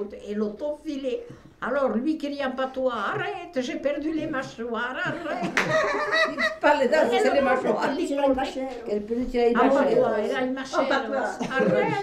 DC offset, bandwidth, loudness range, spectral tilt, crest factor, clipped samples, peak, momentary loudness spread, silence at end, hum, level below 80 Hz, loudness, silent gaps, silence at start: under 0.1%; 13 kHz; 6 LU; -5 dB/octave; 18 dB; under 0.1%; -6 dBFS; 10 LU; 0 s; none; -52 dBFS; -25 LUFS; none; 0 s